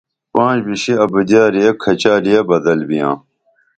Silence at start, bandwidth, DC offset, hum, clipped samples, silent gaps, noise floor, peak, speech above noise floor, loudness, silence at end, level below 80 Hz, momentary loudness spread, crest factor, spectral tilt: 0.35 s; 9 kHz; under 0.1%; none; under 0.1%; none; -59 dBFS; 0 dBFS; 46 dB; -14 LUFS; 0.6 s; -54 dBFS; 6 LU; 14 dB; -5.5 dB/octave